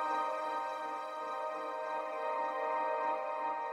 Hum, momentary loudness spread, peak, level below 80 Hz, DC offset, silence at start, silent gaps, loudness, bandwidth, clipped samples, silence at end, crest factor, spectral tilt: none; 5 LU; -24 dBFS; -88 dBFS; under 0.1%; 0 s; none; -37 LUFS; 14 kHz; under 0.1%; 0 s; 12 dB; -2.5 dB/octave